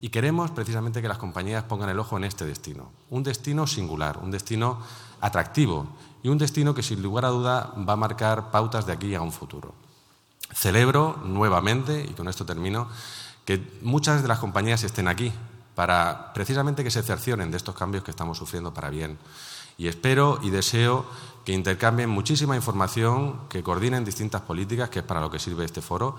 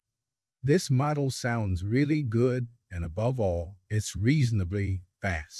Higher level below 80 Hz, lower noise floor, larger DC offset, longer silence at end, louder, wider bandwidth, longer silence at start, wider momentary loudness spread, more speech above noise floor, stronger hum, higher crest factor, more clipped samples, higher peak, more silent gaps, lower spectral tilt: about the same, -50 dBFS vs -52 dBFS; second, -59 dBFS vs -90 dBFS; neither; about the same, 0 s vs 0 s; about the same, -26 LUFS vs -28 LUFS; first, 19 kHz vs 12 kHz; second, 0 s vs 0.65 s; first, 12 LU vs 9 LU; second, 33 dB vs 63 dB; neither; first, 22 dB vs 16 dB; neither; first, -2 dBFS vs -12 dBFS; neither; second, -5 dB/octave vs -6.5 dB/octave